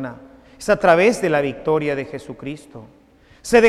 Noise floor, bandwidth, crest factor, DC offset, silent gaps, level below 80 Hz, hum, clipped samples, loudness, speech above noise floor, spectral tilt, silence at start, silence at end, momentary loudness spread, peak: -43 dBFS; 14 kHz; 18 dB; under 0.1%; none; -48 dBFS; none; under 0.1%; -18 LUFS; 24 dB; -5 dB/octave; 0 s; 0 s; 18 LU; -2 dBFS